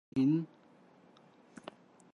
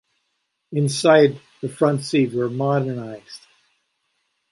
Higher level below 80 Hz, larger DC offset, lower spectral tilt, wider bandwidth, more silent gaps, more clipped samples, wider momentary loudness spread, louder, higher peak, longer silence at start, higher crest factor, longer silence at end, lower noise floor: second, -74 dBFS vs -68 dBFS; neither; first, -8.5 dB/octave vs -6 dB/octave; second, 8.8 kHz vs 11.5 kHz; neither; neither; first, 23 LU vs 20 LU; second, -32 LUFS vs -20 LUFS; second, -20 dBFS vs -2 dBFS; second, 0.15 s vs 0.7 s; about the same, 16 dB vs 20 dB; first, 1.7 s vs 1.15 s; second, -62 dBFS vs -74 dBFS